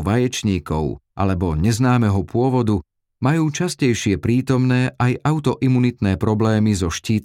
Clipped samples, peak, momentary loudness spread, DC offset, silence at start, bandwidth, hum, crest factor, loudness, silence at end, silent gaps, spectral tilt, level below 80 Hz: under 0.1%; -4 dBFS; 5 LU; under 0.1%; 0 s; 14.5 kHz; none; 14 dB; -19 LUFS; 0 s; none; -6.5 dB/octave; -38 dBFS